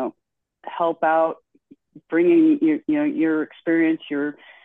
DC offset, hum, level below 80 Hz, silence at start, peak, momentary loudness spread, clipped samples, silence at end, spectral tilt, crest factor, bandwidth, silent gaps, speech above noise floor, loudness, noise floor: under 0.1%; none; -72 dBFS; 0 s; -8 dBFS; 14 LU; under 0.1%; 0.3 s; -8.5 dB/octave; 14 dB; 3.8 kHz; none; 57 dB; -21 LUFS; -77 dBFS